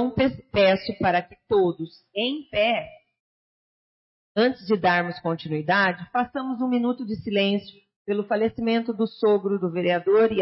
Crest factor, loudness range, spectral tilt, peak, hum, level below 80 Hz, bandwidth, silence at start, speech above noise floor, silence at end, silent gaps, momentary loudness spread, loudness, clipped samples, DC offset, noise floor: 16 dB; 3 LU; -9.5 dB/octave; -8 dBFS; none; -56 dBFS; 5.8 kHz; 0 s; over 67 dB; 0 s; 3.20-4.35 s, 7.96-8.05 s; 8 LU; -24 LUFS; under 0.1%; under 0.1%; under -90 dBFS